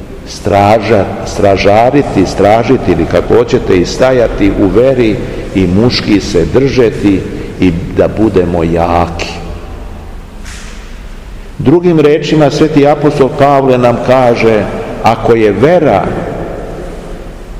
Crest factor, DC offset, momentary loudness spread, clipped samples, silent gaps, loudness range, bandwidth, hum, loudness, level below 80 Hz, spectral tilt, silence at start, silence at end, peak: 10 dB; 0.6%; 19 LU; 3%; none; 5 LU; 15 kHz; none; -9 LUFS; -26 dBFS; -6.5 dB/octave; 0 s; 0 s; 0 dBFS